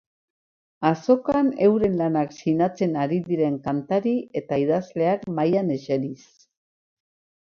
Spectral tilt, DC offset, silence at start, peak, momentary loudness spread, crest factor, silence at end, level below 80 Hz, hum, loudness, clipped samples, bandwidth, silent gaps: -8 dB/octave; under 0.1%; 0.8 s; -6 dBFS; 7 LU; 18 dB; 1.35 s; -60 dBFS; none; -23 LUFS; under 0.1%; 7 kHz; none